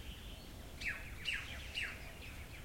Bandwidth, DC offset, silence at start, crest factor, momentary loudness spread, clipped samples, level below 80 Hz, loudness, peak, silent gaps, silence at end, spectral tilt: 16.5 kHz; under 0.1%; 0 s; 18 dB; 11 LU; under 0.1%; -54 dBFS; -44 LUFS; -26 dBFS; none; 0 s; -3 dB/octave